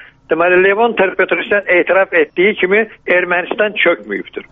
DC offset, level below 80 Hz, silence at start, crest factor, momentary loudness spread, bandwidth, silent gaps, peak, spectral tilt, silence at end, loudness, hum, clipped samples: under 0.1%; -54 dBFS; 0.3 s; 14 dB; 6 LU; 3.9 kHz; none; 0 dBFS; -2 dB/octave; 0.1 s; -13 LUFS; none; under 0.1%